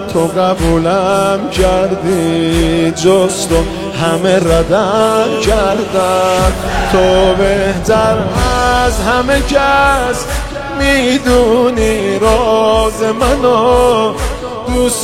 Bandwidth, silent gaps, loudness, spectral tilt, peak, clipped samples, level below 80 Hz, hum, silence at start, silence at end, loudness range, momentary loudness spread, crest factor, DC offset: 16.5 kHz; none; -12 LUFS; -5 dB/octave; 0 dBFS; under 0.1%; -22 dBFS; none; 0 s; 0 s; 1 LU; 5 LU; 12 dB; 0.3%